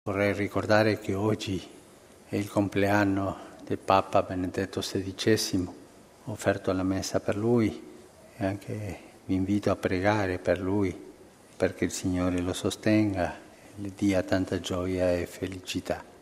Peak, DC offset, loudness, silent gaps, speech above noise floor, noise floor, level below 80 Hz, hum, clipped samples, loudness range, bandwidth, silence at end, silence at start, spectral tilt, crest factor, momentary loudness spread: -6 dBFS; under 0.1%; -28 LUFS; none; 25 dB; -53 dBFS; -56 dBFS; none; under 0.1%; 2 LU; 15.5 kHz; 0.1 s; 0.05 s; -5.5 dB/octave; 22 dB; 12 LU